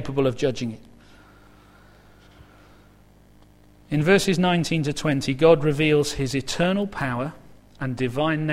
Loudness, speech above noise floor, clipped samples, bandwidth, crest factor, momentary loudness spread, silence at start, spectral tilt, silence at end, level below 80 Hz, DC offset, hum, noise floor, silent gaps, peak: -22 LUFS; 31 dB; under 0.1%; 15.5 kHz; 22 dB; 13 LU; 0 s; -5.5 dB/octave; 0 s; -48 dBFS; under 0.1%; 50 Hz at -45 dBFS; -52 dBFS; none; -2 dBFS